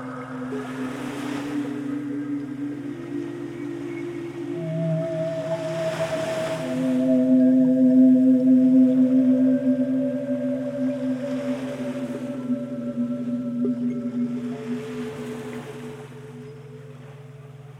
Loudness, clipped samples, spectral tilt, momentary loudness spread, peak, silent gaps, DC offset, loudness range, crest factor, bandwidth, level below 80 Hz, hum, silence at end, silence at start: -23 LUFS; under 0.1%; -7.5 dB/octave; 19 LU; -8 dBFS; none; under 0.1%; 13 LU; 14 dB; 10.5 kHz; -66 dBFS; none; 0 s; 0 s